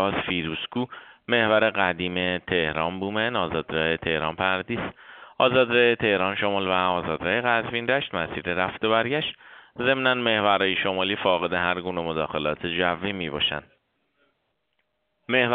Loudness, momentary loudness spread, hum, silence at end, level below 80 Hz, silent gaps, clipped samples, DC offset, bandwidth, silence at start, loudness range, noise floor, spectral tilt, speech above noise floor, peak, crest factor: -24 LUFS; 8 LU; none; 0 s; -56 dBFS; none; under 0.1%; under 0.1%; 4.7 kHz; 0 s; 4 LU; -75 dBFS; -2 dB/octave; 51 dB; -6 dBFS; 20 dB